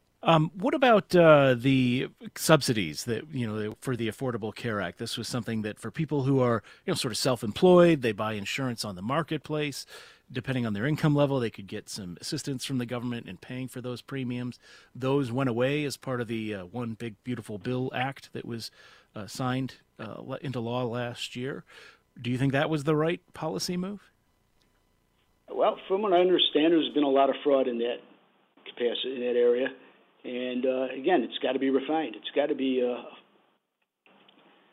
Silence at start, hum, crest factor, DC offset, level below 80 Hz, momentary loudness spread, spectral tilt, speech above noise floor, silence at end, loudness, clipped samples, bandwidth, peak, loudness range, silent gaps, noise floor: 0.25 s; none; 24 dB; under 0.1%; -64 dBFS; 16 LU; -5.5 dB/octave; 52 dB; 1.55 s; -28 LUFS; under 0.1%; 16 kHz; -4 dBFS; 9 LU; none; -79 dBFS